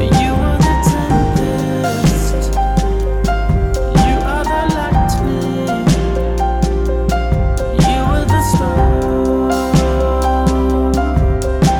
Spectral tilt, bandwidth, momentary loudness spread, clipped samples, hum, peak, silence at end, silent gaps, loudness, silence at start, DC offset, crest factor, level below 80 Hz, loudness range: -6.5 dB/octave; 17.5 kHz; 4 LU; under 0.1%; none; -2 dBFS; 0 s; none; -15 LUFS; 0 s; under 0.1%; 10 dB; -18 dBFS; 1 LU